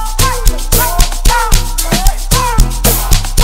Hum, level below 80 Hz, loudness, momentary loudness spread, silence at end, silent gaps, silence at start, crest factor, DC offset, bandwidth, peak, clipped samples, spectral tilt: none; -12 dBFS; -12 LUFS; 3 LU; 0 s; none; 0 s; 10 dB; 1%; 16.5 kHz; 0 dBFS; 0.2%; -3 dB/octave